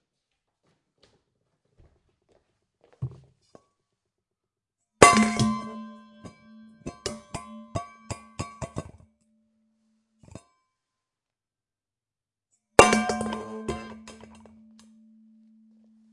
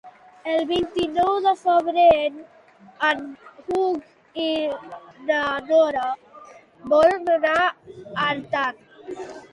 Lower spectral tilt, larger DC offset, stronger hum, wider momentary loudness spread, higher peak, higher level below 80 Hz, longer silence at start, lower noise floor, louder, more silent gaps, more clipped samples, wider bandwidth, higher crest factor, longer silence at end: about the same, -4 dB/octave vs -4.5 dB/octave; neither; neither; first, 26 LU vs 19 LU; first, 0 dBFS vs -4 dBFS; about the same, -54 dBFS vs -58 dBFS; first, 3 s vs 0.05 s; first, under -90 dBFS vs -46 dBFS; about the same, -23 LUFS vs -21 LUFS; neither; neither; about the same, 11.5 kHz vs 11 kHz; first, 30 dB vs 18 dB; first, 2 s vs 0.05 s